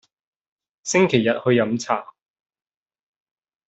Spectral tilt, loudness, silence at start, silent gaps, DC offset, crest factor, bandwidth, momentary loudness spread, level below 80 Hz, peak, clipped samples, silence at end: -5 dB/octave; -20 LUFS; 0.85 s; none; under 0.1%; 20 dB; 8.2 kHz; 8 LU; -66 dBFS; -4 dBFS; under 0.1%; 1.65 s